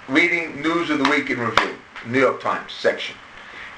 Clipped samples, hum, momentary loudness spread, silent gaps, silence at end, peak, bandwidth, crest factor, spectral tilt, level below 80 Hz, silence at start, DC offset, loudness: under 0.1%; none; 16 LU; none; 0 s; 0 dBFS; 10.5 kHz; 22 dB; -4.5 dB/octave; -56 dBFS; 0 s; under 0.1%; -21 LUFS